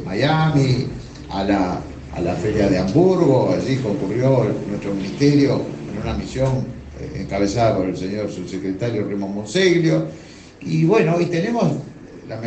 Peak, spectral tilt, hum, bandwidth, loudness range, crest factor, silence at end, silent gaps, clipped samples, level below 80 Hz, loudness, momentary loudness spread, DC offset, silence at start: -2 dBFS; -7 dB/octave; none; 8.8 kHz; 4 LU; 16 dB; 0 s; none; under 0.1%; -42 dBFS; -19 LUFS; 14 LU; under 0.1%; 0 s